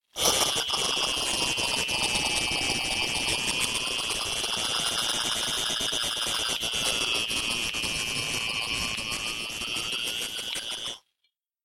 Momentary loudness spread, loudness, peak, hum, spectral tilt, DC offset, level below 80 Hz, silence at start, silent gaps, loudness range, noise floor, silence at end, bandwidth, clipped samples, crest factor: 6 LU; -26 LUFS; -8 dBFS; none; -0.5 dB/octave; under 0.1%; -50 dBFS; 0.15 s; none; 4 LU; -77 dBFS; 0.65 s; 16.5 kHz; under 0.1%; 22 dB